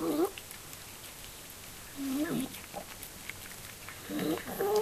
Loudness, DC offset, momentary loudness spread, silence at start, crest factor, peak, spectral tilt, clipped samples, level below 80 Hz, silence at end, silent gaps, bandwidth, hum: -38 LUFS; under 0.1%; 12 LU; 0 s; 18 dB; -18 dBFS; -4 dB/octave; under 0.1%; -60 dBFS; 0 s; none; 14.5 kHz; none